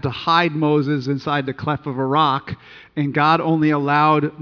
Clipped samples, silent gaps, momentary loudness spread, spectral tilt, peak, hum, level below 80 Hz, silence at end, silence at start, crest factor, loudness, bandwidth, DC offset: under 0.1%; none; 9 LU; -7.5 dB/octave; -2 dBFS; none; -56 dBFS; 0 s; 0 s; 18 dB; -18 LUFS; 5.4 kHz; under 0.1%